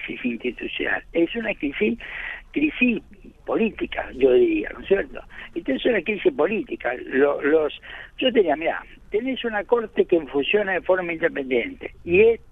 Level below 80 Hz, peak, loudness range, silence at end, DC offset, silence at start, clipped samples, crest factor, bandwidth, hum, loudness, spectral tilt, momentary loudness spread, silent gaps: -48 dBFS; -6 dBFS; 2 LU; 0.15 s; under 0.1%; 0 s; under 0.1%; 18 dB; 3.9 kHz; none; -23 LUFS; -7.5 dB/octave; 12 LU; none